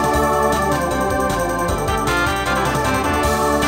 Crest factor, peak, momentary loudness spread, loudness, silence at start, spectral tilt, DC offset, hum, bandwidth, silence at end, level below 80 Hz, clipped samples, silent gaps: 12 dB; -4 dBFS; 3 LU; -18 LUFS; 0 s; -4.5 dB/octave; under 0.1%; none; 16.5 kHz; 0 s; -30 dBFS; under 0.1%; none